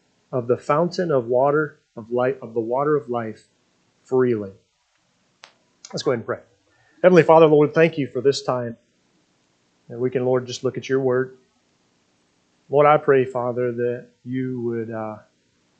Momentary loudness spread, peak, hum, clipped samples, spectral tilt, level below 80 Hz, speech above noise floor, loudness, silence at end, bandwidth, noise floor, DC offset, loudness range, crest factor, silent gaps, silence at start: 16 LU; 0 dBFS; 60 Hz at -50 dBFS; under 0.1%; -6.5 dB/octave; -72 dBFS; 47 dB; -21 LUFS; 0.6 s; 8.6 kHz; -67 dBFS; under 0.1%; 8 LU; 22 dB; none; 0.3 s